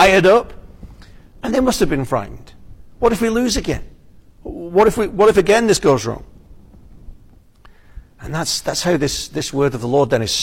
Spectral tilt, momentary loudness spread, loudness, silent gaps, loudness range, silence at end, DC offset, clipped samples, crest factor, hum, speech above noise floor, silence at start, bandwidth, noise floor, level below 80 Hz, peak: -4.5 dB/octave; 16 LU; -17 LUFS; none; 7 LU; 0 s; under 0.1%; under 0.1%; 16 dB; none; 30 dB; 0 s; 16.5 kHz; -46 dBFS; -36 dBFS; -2 dBFS